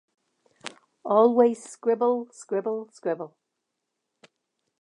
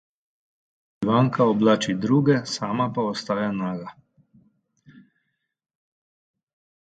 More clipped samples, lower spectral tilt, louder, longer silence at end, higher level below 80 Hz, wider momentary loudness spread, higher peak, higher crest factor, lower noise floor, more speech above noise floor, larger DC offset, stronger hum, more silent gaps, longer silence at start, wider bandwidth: neither; about the same, -5.5 dB/octave vs -6.5 dB/octave; second, -25 LUFS vs -22 LUFS; second, 1.55 s vs 3 s; second, -86 dBFS vs -66 dBFS; first, 22 LU vs 10 LU; about the same, -8 dBFS vs -6 dBFS; about the same, 20 dB vs 20 dB; first, -82 dBFS vs -76 dBFS; first, 58 dB vs 54 dB; neither; neither; neither; second, 0.65 s vs 1 s; first, 11 kHz vs 9.2 kHz